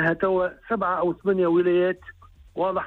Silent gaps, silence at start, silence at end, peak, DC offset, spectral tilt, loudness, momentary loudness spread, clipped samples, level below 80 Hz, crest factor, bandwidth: none; 0 s; 0 s; -10 dBFS; under 0.1%; -9 dB/octave; -23 LUFS; 8 LU; under 0.1%; -54 dBFS; 14 dB; 4.2 kHz